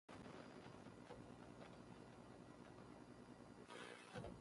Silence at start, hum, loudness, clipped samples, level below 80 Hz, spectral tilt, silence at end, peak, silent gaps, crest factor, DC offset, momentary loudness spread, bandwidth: 0.1 s; 60 Hz at -70 dBFS; -60 LUFS; under 0.1%; -76 dBFS; -5.5 dB/octave; 0 s; -40 dBFS; none; 20 dB; under 0.1%; 6 LU; 11.5 kHz